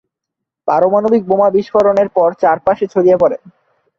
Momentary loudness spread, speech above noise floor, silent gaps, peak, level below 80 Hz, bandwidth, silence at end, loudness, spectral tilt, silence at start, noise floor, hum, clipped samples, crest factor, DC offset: 4 LU; 68 dB; none; -2 dBFS; -54 dBFS; 7 kHz; 0.5 s; -13 LUFS; -8 dB/octave; 0.65 s; -80 dBFS; none; under 0.1%; 12 dB; under 0.1%